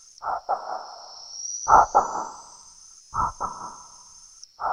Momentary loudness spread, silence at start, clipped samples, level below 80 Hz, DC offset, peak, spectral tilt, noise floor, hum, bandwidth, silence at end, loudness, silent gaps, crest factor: 27 LU; 0.2 s; under 0.1%; -50 dBFS; under 0.1%; -2 dBFS; -2.5 dB/octave; -49 dBFS; none; 10.5 kHz; 0 s; -24 LUFS; none; 24 dB